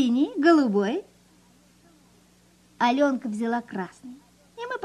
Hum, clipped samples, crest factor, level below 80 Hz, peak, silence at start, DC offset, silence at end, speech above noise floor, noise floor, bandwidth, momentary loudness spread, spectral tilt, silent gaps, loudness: 60 Hz at -60 dBFS; under 0.1%; 18 dB; -70 dBFS; -8 dBFS; 0 s; under 0.1%; 0 s; 35 dB; -58 dBFS; 11.5 kHz; 19 LU; -6 dB/octave; none; -24 LUFS